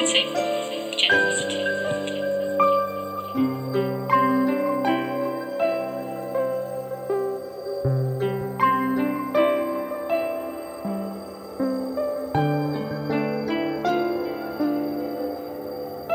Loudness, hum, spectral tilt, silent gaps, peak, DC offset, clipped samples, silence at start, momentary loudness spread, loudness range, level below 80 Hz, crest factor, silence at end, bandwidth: -25 LUFS; none; -4.5 dB/octave; none; -4 dBFS; under 0.1%; under 0.1%; 0 s; 11 LU; 4 LU; -58 dBFS; 20 dB; 0 s; over 20 kHz